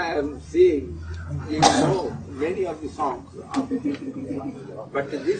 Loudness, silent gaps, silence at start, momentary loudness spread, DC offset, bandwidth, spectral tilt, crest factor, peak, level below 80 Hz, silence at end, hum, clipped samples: -24 LUFS; none; 0 s; 14 LU; under 0.1%; 9.4 kHz; -5 dB/octave; 24 dB; 0 dBFS; -46 dBFS; 0 s; none; under 0.1%